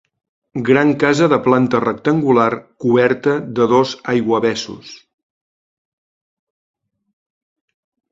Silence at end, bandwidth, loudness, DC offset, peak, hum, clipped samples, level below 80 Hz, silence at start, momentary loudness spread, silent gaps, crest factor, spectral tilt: 3.15 s; 7.8 kHz; -15 LUFS; under 0.1%; 0 dBFS; none; under 0.1%; -58 dBFS; 0.55 s; 9 LU; none; 18 dB; -6 dB/octave